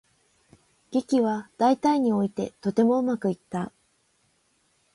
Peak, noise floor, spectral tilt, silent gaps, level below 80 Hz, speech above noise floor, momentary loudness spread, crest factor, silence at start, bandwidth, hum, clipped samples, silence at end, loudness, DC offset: -10 dBFS; -68 dBFS; -7 dB/octave; none; -68 dBFS; 44 dB; 10 LU; 18 dB; 0.9 s; 11.5 kHz; none; under 0.1%; 1.25 s; -25 LUFS; under 0.1%